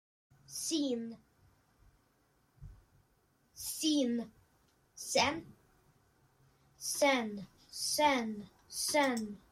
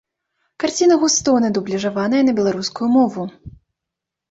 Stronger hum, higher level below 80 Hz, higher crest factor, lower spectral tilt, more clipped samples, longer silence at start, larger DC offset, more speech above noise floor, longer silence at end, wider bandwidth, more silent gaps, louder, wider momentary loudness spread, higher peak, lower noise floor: neither; second, -68 dBFS vs -54 dBFS; first, 22 dB vs 14 dB; second, -2 dB/octave vs -4 dB/octave; neither; about the same, 0.5 s vs 0.6 s; neither; second, 40 dB vs 66 dB; second, 0.15 s vs 0.8 s; first, 16.5 kHz vs 8 kHz; neither; second, -34 LUFS vs -17 LUFS; first, 16 LU vs 8 LU; second, -16 dBFS vs -4 dBFS; second, -73 dBFS vs -83 dBFS